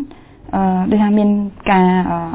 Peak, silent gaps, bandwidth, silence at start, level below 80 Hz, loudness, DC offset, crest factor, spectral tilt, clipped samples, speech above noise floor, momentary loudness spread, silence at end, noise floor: -2 dBFS; none; 4 kHz; 0 s; -40 dBFS; -15 LUFS; under 0.1%; 14 dB; -11.5 dB/octave; under 0.1%; 23 dB; 7 LU; 0 s; -37 dBFS